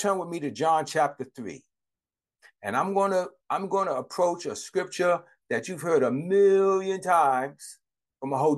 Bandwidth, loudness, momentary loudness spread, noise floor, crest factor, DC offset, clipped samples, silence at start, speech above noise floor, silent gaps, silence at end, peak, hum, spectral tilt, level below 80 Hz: 12.5 kHz; -26 LUFS; 16 LU; under -90 dBFS; 16 dB; under 0.1%; under 0.1%; 0 s; over 65 dB; none; 0 s; -10 dBFS; none; -5 dB/octave; -78 dBFS